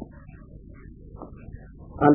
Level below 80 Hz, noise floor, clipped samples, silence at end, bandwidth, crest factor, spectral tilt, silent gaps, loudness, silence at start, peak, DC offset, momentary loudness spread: -46 dBFS; -45 dBFS; under 0.1%; 0 s; 3.3 kHz; 24 dB; -12.5 dB/octave; none; -32 LUFS; 0 s; -2 dBFS; under 0.1%; 7 LU